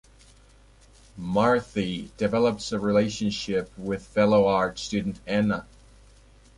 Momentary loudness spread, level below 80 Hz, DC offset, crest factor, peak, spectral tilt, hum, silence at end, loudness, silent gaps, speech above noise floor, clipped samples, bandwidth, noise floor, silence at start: 10 LU; -52 dBFS; under 0.1%; 18 dB; -8 dBFS; -6 dB/octave; none; 0.95 s; -25 LUFS; none; 30 dB; under 0.1%; 11.5 kHz; -54 dBFS; 1.15 s